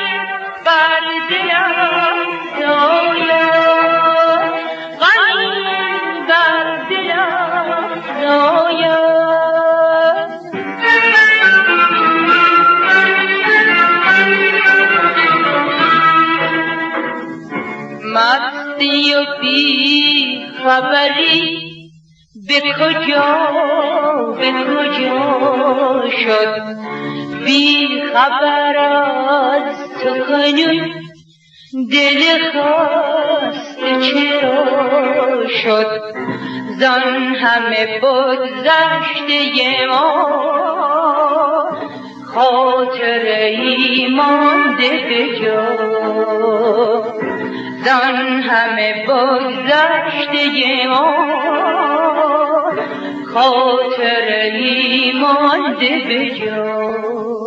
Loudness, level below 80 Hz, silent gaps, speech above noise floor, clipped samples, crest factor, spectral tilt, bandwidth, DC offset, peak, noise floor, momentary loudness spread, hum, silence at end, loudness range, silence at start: -13 LUFS; -70 dBFS; none; 32 dB; under 0.1%; 14 dB; -4 dB/octave; 8 kHz; under 0.1%; 0 dBFS; -45 dBFS; 10 LU; none; 0 s; 5 LU; 0 s